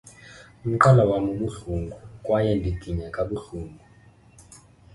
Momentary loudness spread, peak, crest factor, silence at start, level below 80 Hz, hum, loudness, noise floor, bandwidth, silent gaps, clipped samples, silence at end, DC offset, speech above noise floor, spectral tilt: 20 LU; -2 dBFS; 24 dB; 0.25 s; -42 dBFS; none; -23 LUFS; -53 dBFS; 11.5 kHz; none; under 0.1%; 0.4 s; under 0.1%; 30 dB; -7.5 dB/octave